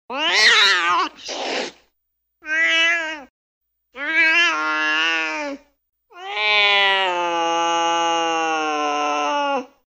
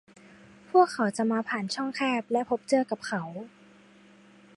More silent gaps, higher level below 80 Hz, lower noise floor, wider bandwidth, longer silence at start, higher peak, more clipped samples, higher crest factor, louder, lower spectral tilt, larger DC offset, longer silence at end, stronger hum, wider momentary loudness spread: first, 3.30-3.61 s vs none; first, -68 dBFS vs -76 dBFS; first, -74 dBFS vs -55 dBFS; first, 13.5 kHz vs 11.5 kHz; second, 0.1 s vs 0.75 s; first, -4 dBFS vs -8 dBFS; neither; second, 16 dB vs 22 dB; first, -17 LUFS vs -27 LUFS; second, 0 dB/octave vs -5 dB/octave; neither; second, 0.3 s vs 1.1 s; neither; first, 15 LU vs 11 LU